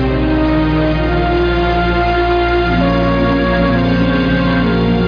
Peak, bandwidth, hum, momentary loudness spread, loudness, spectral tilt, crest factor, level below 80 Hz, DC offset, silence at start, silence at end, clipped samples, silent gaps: -2 dBFS; 5.2 kHz; none; 1 LU; -14 LUFS; -8.5 dB/octave; 10 dB; -22 dBFS; under 0.1%; 0 s; 0 s; under 0.1%; none